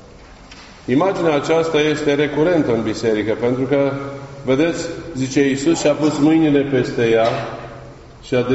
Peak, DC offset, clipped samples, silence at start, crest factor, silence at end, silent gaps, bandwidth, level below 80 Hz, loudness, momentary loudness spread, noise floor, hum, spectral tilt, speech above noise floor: -4 dBFS; under 0.1%; under 0.1%; 0 s; 14 dB; 0 s; none; 8 kHz; -46 dBFS; -17 LUFS; 12 LU; -41 dBFS; none; -5 dB/octave; 24 dB